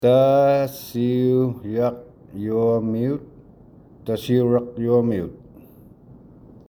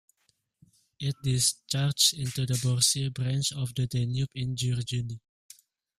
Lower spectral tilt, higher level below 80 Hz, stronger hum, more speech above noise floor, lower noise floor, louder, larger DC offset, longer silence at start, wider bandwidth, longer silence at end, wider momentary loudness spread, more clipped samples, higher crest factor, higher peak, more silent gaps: first, -8 dB/octave vs -3.5 dB/octave; about the same, -54 dBFS vs -58 dBFS; neither; second, 28 dB vs 45 dB; second, -48 dBFS vs -73 dBFS; first, -21 LUFS vs -27 LUFS; neither; second, 0 s vs 1 s; first, 20 kHz vs 15.5 kHz; first, 1.35 s vs 0.8 s; first, 15 LU vs 10 LU; neither; second, 16 dB vs 22 dB; about the same, -6 dBFS vs -8 dBFS; neither